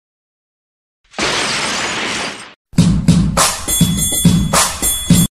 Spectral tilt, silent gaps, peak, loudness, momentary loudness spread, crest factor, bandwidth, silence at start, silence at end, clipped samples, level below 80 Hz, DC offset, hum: -3.5 dB/octave; 2.56-2.65 s; 0 dBFS; -14 LUFS; 8 LU; 16 dB; 16 kHz; 1.15 s; 0.05 s; under 0.1%; -28 dBFS; under 0.1%; none